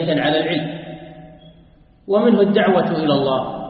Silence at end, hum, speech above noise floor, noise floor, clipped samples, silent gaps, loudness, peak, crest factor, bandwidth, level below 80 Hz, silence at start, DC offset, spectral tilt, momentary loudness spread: 0 s; none; 32 dB; -49 dBFS; under 0.1%; none; -17 LUFS; -2 dBFS; 16 dB; 5.2 kHz; -52 dBFS; 0 s; under 0.1%; -11 dB/octave; 17 LU